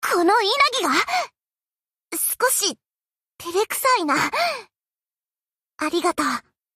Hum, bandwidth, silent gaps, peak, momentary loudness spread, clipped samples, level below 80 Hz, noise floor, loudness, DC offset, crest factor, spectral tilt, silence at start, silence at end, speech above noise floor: none; 15.5 kHz; none; -6 dBFS; 13 LU; under 0.1%; -66 dBFS; under -90 dBFS; -21 LUFS; under 0.1%; 18 dB; -1 dB/octave; 0 s; 0.35 s; over 69 dB